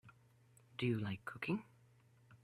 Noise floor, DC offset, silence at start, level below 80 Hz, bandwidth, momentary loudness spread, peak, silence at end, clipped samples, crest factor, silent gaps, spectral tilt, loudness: -69 dBFS; under 0.1%; 0.05 s; -76 dBFS; 13.5 kHz; 6 LU; -26 dBFS; 0.1 s; under 0.1%; 20 dB; none; -7.5 dB/octave; -42 LUFS